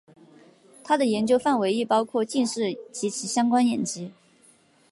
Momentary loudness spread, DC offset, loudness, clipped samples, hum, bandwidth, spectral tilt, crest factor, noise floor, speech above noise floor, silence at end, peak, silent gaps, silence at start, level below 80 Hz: 9 LU; under 0.1%; -24 LUFS; under 0.1%; none; 11.5 kHz; -4 dB/octave; 16 dB; -59 dBFS; 35 dB; 0.8 s; -8 dBFS; none; 0.85 s; -70 dBFS